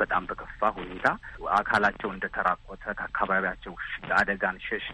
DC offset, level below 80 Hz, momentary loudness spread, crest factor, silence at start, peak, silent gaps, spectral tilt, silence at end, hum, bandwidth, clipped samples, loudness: under 0.1%; -50 dBFS; 11 LU; 22 dB; 0 s; -6 dBFS; none; -5 dB/octave; 0 s; none; 9.6 kHz; under 0.1%; -28 LUFS